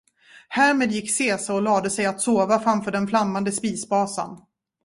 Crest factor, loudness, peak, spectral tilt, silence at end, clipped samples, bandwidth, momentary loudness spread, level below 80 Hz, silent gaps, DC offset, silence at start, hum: 16 dB; -22 LUFS; -6 dBFS; -4 dB/octave; 0.45 s; under 0.1%; 11.5 kHz; 7 LU; -62 dBFS; none; under 0.1%; 0.35 s; none